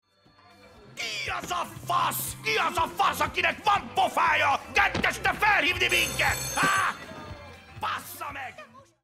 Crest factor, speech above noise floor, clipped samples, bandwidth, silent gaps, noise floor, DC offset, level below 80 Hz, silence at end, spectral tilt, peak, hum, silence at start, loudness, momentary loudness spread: 18 dB; 32 dB; under 0.1%; 16 kHz; none; -58 dBFS; under 0.1%; -50 dBFS; 0.25 s; -2 dB/octave; -10 dBFS; none; 0.65 s; -25 LUFS; 16 LU